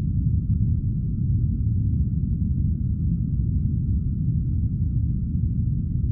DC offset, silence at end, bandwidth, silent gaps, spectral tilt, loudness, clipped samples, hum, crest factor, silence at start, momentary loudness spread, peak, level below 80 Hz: under 0.1%; 0 s; 0.7 kHz; none; -18 dB/octave; -24 LUFS; under 0.1%; none; 12 dB; 0 s; 2 LU; -10 dBFS; -28 dBFS